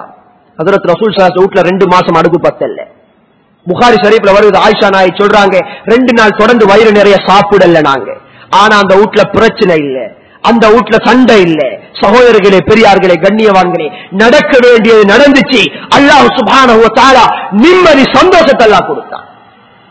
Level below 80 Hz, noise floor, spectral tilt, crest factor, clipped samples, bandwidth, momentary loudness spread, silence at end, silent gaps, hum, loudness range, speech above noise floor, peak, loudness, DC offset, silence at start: -38 dBFS; -47 dBFS; -5 dB/octave; 6 dB; 20%; 8 kHz; 10 LU; 0.7 s; none; none; 3 LU; 42 dB; 0 dBFS; -5 LUFS; 0.7%; 0 s